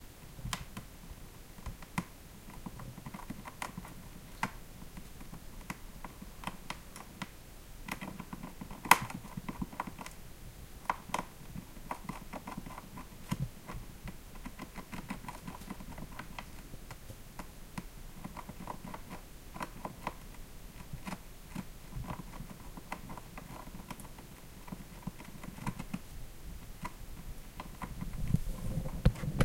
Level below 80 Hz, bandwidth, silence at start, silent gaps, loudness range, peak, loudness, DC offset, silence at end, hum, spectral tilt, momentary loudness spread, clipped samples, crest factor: -48 dBFS; 16.5 kHz; 0 s; none; 12 LU; -2 dBFS; -42 LUFS; under 0.1%; 0 s; none; -4.5 dB/octave; 11 LU; under 0.1%; 38 dB